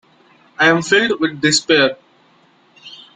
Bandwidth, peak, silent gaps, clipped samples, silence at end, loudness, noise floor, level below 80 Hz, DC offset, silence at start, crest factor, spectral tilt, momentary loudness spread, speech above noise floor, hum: 9.6 kHz; -2 dBFS; none; under 0.1%; 0.2 s; -14 LUFS; -53 dBFS; -60 dBFS; under 0.1%; 0.6 s; 16 dB; -3 dB/octave; 6 LU; 39 dB; none